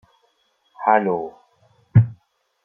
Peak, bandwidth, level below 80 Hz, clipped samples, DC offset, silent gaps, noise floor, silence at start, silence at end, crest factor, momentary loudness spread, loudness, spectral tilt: -2 dBFS; 3.5 kHz; -52 dBFS; under 0.1%; under 0.1%; none; -65 dBFS; 0.8 s; 0.5 s; 20 dB; 9 LU; -20 LUFS; -11.5 dB/octave